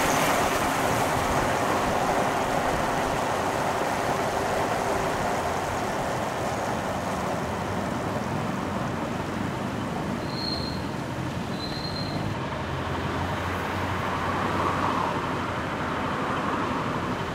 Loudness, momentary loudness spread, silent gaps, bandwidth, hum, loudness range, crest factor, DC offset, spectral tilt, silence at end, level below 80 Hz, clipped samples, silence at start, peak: -27 LUFS; 6 LU; none; 16 kHz; none; 5 LU; 16 dB; under 0.1%; -4.5 dB/octave; 0 s; -46 dBFS; under 0.1%; 0 s; -10 dBFS